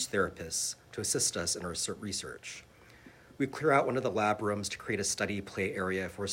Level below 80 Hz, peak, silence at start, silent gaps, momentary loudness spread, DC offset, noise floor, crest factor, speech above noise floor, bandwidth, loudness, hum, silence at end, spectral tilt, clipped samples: -62 dBFS; -10 dBFS; 0 s; none; 9 LU; under 0.1%; -56 dBFS; 22 dB; 23 dB; 16 kHz; -32 LUFS; none; 0 s; -3 dB/octave; under 0.1%